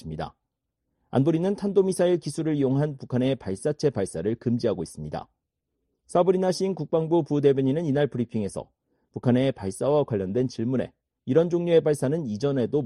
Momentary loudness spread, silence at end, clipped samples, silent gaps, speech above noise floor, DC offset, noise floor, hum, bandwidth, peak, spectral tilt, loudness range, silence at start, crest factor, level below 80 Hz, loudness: 12 LU; 0 s; under 0.1%; none; 56 dB; under 0.1%; -80 dBFS; none; 11.5 kHz; -8 dBFS; -7 dB/octave; 3 LU; 0.05 s; 18 dB; -58 dBFS; -25 LUFS